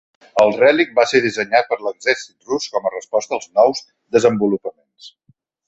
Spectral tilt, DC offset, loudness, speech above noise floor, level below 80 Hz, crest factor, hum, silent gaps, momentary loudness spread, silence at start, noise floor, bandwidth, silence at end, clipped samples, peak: -4 dB/octave; under 0.1%; -17 LUFS; 43 dB; -62 dBFS; 18 dB; none; none; 10 LU; 0.35 s; -60 dBFS; 8.2 kHz; 0.6 s; under 0.1%; 0 dBFS